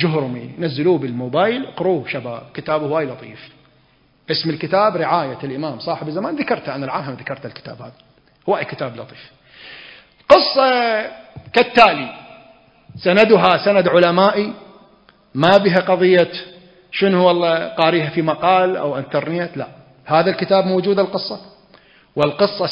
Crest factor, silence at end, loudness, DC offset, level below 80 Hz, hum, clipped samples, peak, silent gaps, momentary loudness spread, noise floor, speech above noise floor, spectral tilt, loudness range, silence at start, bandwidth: 18 dB; 0 s; -17 LUFS; under 0.1%; -58 dBFS; none; under 0.1%; 0 dBFS; none; 18 LU; -56 dBFS; 39 dB; -7 dB/octave; 10 LU; 0 s; 8 kHz